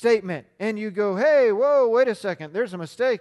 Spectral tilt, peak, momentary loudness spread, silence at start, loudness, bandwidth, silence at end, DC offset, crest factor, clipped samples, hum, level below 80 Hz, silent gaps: -6 dB/octave; -8 dBFS; 11 LU; 0 s; -22 LUFS; 12 kHz; 0.05 s; under 0.1%; 14 dB; under 0.1%; none; -72 dBFS; none